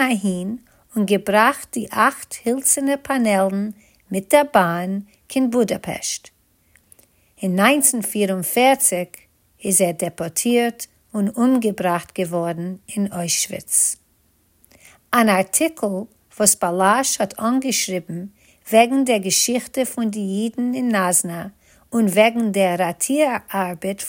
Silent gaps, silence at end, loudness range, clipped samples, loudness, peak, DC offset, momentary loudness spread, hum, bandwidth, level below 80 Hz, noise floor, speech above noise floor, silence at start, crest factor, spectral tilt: none; 0 s; 3 LU; under 0.1%; -19 LUFS; 0 dBFS; under 0.1%; 12 LU; none; 17 kHz; -62 dBFS; -61 dBFS; 41 dB; 0 s; 20 dB; -3.5 dB/octave